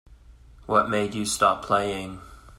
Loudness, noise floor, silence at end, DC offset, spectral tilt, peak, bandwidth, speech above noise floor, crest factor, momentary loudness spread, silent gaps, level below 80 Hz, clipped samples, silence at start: -24 LUFS; -50 dBFS; 0.05 s; under 0.1%; -4 dB/octave; -6 dBFS; 16 kHz; 26 dB; 22 dB; 14 LU; none; -50 dBFS; under 0.1%; 0.1 s